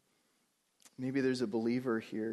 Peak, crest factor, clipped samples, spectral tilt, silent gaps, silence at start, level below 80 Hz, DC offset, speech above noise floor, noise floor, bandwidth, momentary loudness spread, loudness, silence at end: -22 dBFS; 14 dB; under 0.1%; -6.5 dB/octave; none; 1 s; -78 dBFS; under 0.1%; 43 dB; -77 dBFS; 12 kHz; 4 LU; -35 LUFS; 0 s